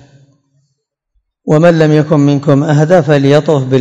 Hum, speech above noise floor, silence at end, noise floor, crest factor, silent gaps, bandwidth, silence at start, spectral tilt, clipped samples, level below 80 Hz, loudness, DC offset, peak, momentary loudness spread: none; 59 dB; 0 s; -67 dBFS; 10 dB; none; 7.8 kHz; 1.45 s; -7.5 dB/octave; 2%; -50 dBFS; -9 LUFS; under 0.1%; 0 dBFS; 4 LU